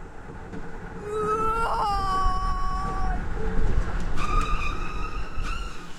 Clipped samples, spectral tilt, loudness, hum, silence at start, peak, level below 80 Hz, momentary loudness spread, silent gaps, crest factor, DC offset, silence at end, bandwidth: under 0.1%; -5.5 dB/octave; -29 LUFS; none; 0 s; -10 dBFS; -28 dBFS; 14 LU; none; 14 dB; under 0.1%; 0 s; 10.5 kHz